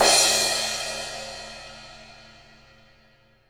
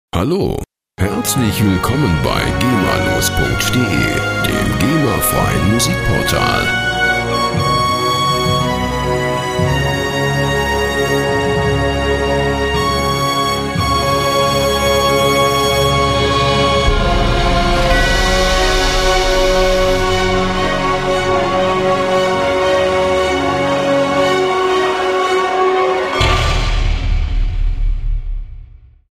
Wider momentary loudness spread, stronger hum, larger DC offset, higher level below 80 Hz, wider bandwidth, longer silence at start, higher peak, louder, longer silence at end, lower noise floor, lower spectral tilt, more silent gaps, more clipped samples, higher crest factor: first, 26 LU vs 4 LU; neither; neither; second, -54 dBFS vs -22 dBFS; first, over 20 kHz vs 16 kHz; second, 0 s vs 0.15 s; second, -4 dBFS vs 0 dBFS; second, -21 LUFS vs -14 LUFS; first, 1.3 s vs 0.35 s; first, -59 dBFS vs -38 dBFS; second, 0.5 dB/octave vs -4.5 dB/octave; neither; neither; first, 22 dB vs 14 dB